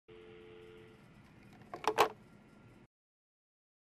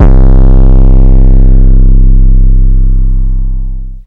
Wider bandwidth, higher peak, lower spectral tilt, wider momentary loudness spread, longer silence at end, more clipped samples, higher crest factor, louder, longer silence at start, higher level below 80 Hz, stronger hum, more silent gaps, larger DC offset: first, 13 kHz vs 1.7 kHz; second, -12 dBFS vs 0 dBFS; second, -3 dB/octave vs -11.5 dB/octave; first, 28 LU vs 9 LU; first, 1.85 s vs 0.05 s; second, under 0.1% vs 40%; first, 30 dB vs 2 dB; second, -34 LUFS vs -9 LUFS; about the same, 0.1 s vs 0 s; second, -74 dBFS vs -2 dBFS; neither; neither; neither